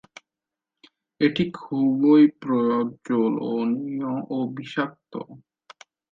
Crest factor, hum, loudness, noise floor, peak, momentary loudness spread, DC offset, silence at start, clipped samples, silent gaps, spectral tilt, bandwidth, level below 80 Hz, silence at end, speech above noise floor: 16 dB; none; -23 LUFS; -88 dBFS; -8 dBFS; 13 LU; under 0.1%; 1.2 s; under 0.1%; none; -7.5 dB/octave; 7.4 kHz; -68 dBFS; 0.75 s; 66 dB